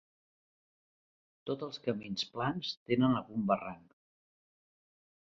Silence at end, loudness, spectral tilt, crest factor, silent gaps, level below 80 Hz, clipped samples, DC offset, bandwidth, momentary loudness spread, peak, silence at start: 1.45 s; -34 LUFS; -4.5 dB/octave; 22 dB; 2.77-2.86 s; -70 dBFS; under 0.1%; under 0.1%; 7.4 kHz; 13 LU; -16 dBFS; 1.45 s